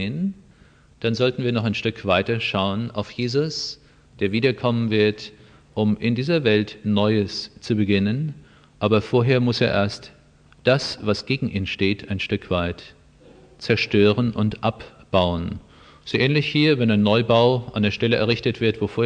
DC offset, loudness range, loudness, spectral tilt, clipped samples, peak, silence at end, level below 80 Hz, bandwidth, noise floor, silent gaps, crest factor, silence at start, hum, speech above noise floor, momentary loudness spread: under 0.1%; 4 LU; -21 LUFS; -6.5 dB/octave; under 0.1%; -4 dBFS; 0 s; -50 dBFS; 9.6 kHz; -53 dBFS; none; 18 dB; 0 s; none; 32 dB; 11 LU